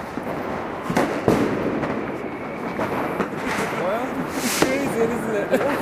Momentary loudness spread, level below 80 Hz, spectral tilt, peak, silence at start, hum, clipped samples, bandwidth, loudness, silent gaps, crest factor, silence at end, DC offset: 8 LU; -50 dBFS; -5 dB/octave; 0 dBFS; 0 s; none; under 0.1%; 15.5 kHz; -23 LUFS; none; 22 dB; 0 s; under 0.1%